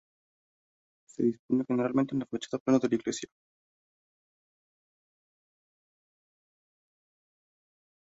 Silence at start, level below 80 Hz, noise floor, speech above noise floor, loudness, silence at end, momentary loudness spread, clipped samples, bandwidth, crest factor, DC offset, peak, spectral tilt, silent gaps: 1.2 s; -74 dBFS; under -90 dBFS; over 61 dB; -30 LUFS; 4.9 s; 11 LU; under 0.1%; 8 kHz; 22 dB; under 0.1%; -12 dBFS; -6 dB/octave; 1.39-1.49 s, 2.60-2.66 s